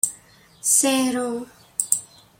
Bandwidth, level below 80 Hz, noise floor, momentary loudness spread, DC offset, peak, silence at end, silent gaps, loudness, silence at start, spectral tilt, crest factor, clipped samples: 16.5 kHz; -66 dBFS; -51 dBFS; 12 LU; under 0.1%; 0 dBFS; 0.35 s; none; -21 LUFS; 0.05 s; -1 dB/octave; 24 dB; under 0.1%